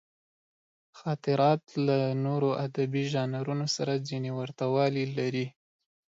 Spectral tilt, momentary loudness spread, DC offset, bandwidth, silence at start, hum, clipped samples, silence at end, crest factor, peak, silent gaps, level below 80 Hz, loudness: -6.5 dB/octave; 8 LU; under 0.1%; 7.8 kHz; 0.95 s; none; under 0.1%; 0.65 s; 18 dB; -12 dBFS; none; -74 dBFS; -29 LUFS